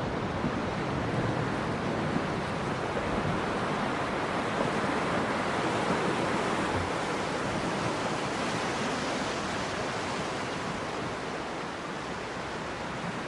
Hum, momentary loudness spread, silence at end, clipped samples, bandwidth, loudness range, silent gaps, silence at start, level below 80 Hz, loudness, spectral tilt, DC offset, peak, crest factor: none; 6 LU; 0 s; under 0.1%; 11.5 kHz; 4 LU; none; 0 s; -52 dBFS; -31 LUFS; -5 dB/octave; under 0.1%; -16 dBFS; 16 dB